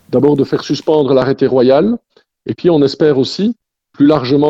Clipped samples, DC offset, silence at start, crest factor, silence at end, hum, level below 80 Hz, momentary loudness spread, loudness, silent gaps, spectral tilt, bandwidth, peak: under 0.1%; under 0.1%; 0.1 s; 12 dB; 0 s; none; -48 dBFS; 9 LU; -13 LUFS; none; -7.5 dB/octave; 8 kHz; 0 dBFS